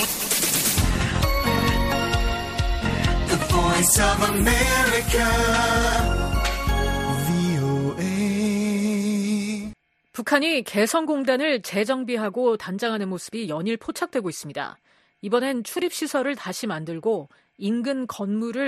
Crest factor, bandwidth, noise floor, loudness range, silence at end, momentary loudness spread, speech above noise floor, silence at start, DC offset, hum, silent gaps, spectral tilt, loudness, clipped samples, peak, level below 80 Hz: 18 dB; 15 kHz; -44 dBFS; 8 LU; 0 s; 10 LU; 21 dB; 0 s; under 0.1%; none; none; -4 dB/octave; -23 LUFS; under 0.1%; -4 dBFS; -32 dBFS